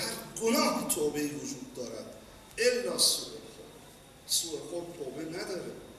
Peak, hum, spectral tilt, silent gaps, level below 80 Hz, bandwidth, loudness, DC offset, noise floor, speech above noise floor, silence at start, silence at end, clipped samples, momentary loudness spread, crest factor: -12 dBFS; none; -2 dB/octave; none; -64 dBFS; 14 kHz; -31 LUFS; under 0.1%; -53 dBFS; 21 dB; 0 s; 0 s; under 0.1%; 23 LU; 22 dB